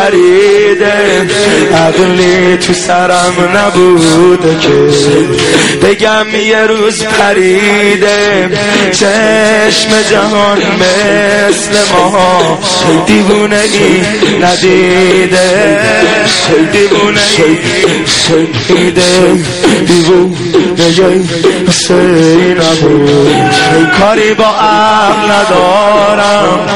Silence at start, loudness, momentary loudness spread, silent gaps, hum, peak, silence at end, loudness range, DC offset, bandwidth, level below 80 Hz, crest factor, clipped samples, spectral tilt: 0 s; -6 LUFS; 3 LU; none; none; 0 dBFS; 0 s; 1 LU; 2%; 12 kHz; -38 dBFS; 6 dB; 2%; -4 dB/octave